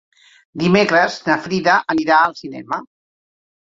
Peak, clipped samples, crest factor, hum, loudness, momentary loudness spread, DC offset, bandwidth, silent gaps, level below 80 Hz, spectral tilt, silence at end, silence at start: 0 dBFS; under 0.1%; 18 dB; none; -16 LUFS; 13 LU; under 0.1%; 7.8 kHz; none; -58 dBFS; -5.5 dB/octave; 0.9 s; 0.55 s